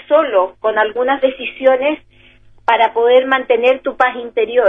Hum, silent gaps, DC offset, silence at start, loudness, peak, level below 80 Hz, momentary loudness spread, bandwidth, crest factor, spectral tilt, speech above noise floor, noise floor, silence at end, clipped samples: none; none; under 0.1%; 0.1 s; -15 LUFS; 0 dBFS; -54 dBFS; 6 LU; 3.9 kHz; 14 dB; -5 dB/octave; 31 dB; -45 dBFS; 0 s; under 0.1%